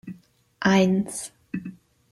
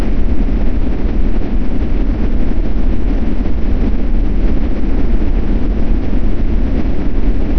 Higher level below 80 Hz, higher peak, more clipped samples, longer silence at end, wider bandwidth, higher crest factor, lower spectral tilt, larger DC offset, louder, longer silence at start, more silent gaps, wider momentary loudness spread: second, -58 dBFS vs -14 dBFS; second, -8 dBFS vs -2 dBFS; neither; first, 0.4 s vs 0 s; first, 12.5 kHz vs 4.9 kHz; first, 18 dB vs 8 dB; second, -5.5 dB/octave vs -9.5 dB/octave; neither; second, -24 LUFS vs -19 LUFS; about the same, 0.05 s vs 0 s; neither; first, 20 LU vs 1 LU